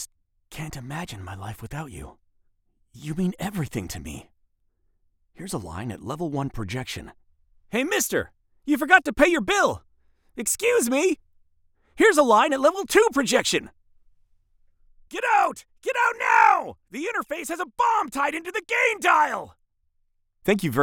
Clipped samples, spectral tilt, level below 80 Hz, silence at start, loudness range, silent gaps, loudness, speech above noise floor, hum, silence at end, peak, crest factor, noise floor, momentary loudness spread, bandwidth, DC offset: under 0.1%; -3.5 dB/octave; -52 dBFS; 0 s; 12 LU; none; -22 LUFS; 46 dB; none; 0 s; -2 dBFS; 22 dB; -69 dBFS; 19 LU; over 20 kHz; under 0.1%